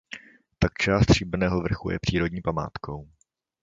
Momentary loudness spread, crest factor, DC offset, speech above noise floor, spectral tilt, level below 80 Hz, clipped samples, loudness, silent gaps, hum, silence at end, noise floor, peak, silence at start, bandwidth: 17 LU; 20 dB; under 0.1%; 21 dB; -6 dB/octave; -38 dBFS; under 0.1%; -25 LUFS; none; none; 0.6 s; -45 dBFS; -6 dBFS; 0.1 s; 7.8 kHz